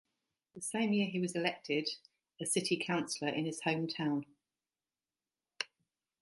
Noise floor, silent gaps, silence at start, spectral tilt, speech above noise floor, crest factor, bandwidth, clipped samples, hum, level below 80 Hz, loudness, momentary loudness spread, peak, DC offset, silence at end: under -90 dBFS; none; 0.55 s; -4 dB/octave; over 55 dB; 22 dB; 12 kHz; under 0.1%; none; -84 dBFS; -36 LUFS; 10 LU; -16 dBFS; under 0.1%; 0.55 s